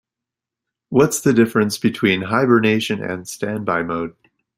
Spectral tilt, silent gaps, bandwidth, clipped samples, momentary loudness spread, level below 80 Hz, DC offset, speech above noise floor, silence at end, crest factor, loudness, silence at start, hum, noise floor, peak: -5 dB/octave; none; 16 kHz; under 0.1%; 10 LU; -56 dBFS; under 0.1%; 68 dB; 0.45 s; 18 dB; -18 LUFS; 0.9 s; none; -86 dBFS; -2 dBFS